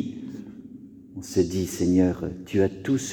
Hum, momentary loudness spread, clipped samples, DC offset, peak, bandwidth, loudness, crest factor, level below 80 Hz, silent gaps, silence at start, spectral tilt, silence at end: none; 21 LU; under 0.1%; under 0.1%; -8 dBFS; 18 kHz; -25 LUFS; 18 dB; -52 dBFS; none; 0 s; -6 dB/octave; 0 s